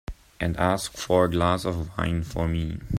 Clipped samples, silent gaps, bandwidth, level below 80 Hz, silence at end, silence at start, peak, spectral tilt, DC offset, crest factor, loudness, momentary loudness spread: under 0.1%; none; 15.5 kHz; -40 dBFS; 0 s; 0.1 s; -6 dBFS; -6 dB/octave; under 0.1%; 18 dB; -26 LUFS; 8 LU